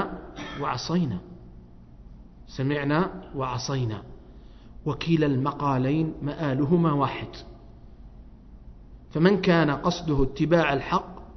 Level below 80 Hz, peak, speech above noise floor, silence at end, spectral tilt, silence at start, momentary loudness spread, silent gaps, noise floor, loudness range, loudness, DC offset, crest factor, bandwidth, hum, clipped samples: -44 dBFS; -4 dBFS; 22 dB; 0 s; -7 dB/octave; 0 s; 14 LU; none; -47 dBFS; 5 LU; -25 LUFS; under 0.1%; 22 dB; 6.4 kHz; none; under 0.1%